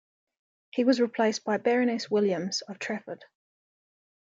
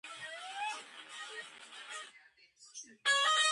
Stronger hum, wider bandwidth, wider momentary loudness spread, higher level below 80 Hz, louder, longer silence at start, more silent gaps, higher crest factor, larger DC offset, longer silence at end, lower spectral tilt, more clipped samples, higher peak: neither; second, 7.8 kHz vs 11.5 kHz; second, 11 LU vs 21 LU; first, -80 dBFS vs under -90 dBFS; first, -27 LUFS vs -35 LUFS; first, 0.75 s vs 0.05 s; neither; about the same, 18 dB vs 18 dB; neither; first, 0.95 s vs 0 s; first, -4.5 dB/octave vs 3 dB/octave; neither; first, -10 dBFS vs -20 dBFS